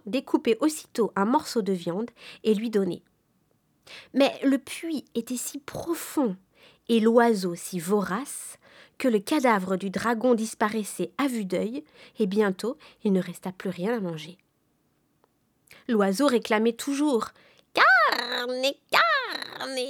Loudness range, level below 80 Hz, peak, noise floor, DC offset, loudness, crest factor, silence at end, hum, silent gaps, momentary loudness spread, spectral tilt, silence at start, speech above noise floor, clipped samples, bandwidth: 6 LU; -70 dBFS; -4 dBFS; -70 dBFS; under 0.1%; -26 LUFS; 22 dB; 0 s; none; none; 13 LU; -4.5 dB/octave; 0.05 s; 44 dB; under 0.1%; over 20 kHz